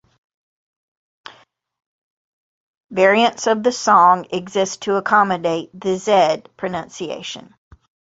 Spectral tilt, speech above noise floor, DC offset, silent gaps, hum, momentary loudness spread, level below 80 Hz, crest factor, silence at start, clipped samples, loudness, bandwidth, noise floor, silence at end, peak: -4 dB/octave; 35 dB; under 0.1%; none; none; 15 LU; -62 dBFS; 18 dB; 2.9 s; under 0.1%; -17 LUFS; 8 kHz; -52 dBFS; 0.7 s; -2 dBFS